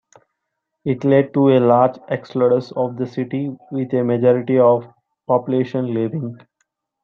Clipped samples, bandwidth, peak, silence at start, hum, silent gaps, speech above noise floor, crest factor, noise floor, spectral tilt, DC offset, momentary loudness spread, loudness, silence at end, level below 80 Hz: under 0.1%; 6.8 kHz; -2 dBFS; 0.85 s; none; none; 60 dB; 16 dB; -77 dBFS; -9.5 dB/octave; under 0.1%; 12 LU; -18 LUFS; 0.7 s; -64 dBFS